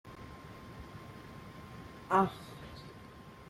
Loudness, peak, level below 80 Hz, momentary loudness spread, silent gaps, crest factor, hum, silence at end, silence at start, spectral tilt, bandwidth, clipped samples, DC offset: -33 LUFS; -14 dBFS; -60 dBFS; 20 LU; none; 24 dB; none; 0 s; 0.05 s; -6.5 dB/octave; 16 kHz; under 0.1%; under 0.1%